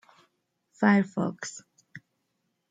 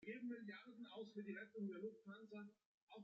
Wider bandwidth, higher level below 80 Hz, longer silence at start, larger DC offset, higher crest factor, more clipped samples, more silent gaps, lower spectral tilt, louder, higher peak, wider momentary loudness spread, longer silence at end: first, 9 kHz vs 7.2 kHz; first, -74 dBFS vs under -90 dBFS; first, 0.8 s vs 0 s; neither; first, 24 dB vs 14 dB; neither; second, none vs 2.66-2.87 s; about the same, -6 dB/octave vs -5 dB/octave; first, -26 LUFS vs -54 LUFS; first, -6 dBFS vs -40 dBFS; first, 17 LU vs 9 LU; first, 0.75 s vs 0 s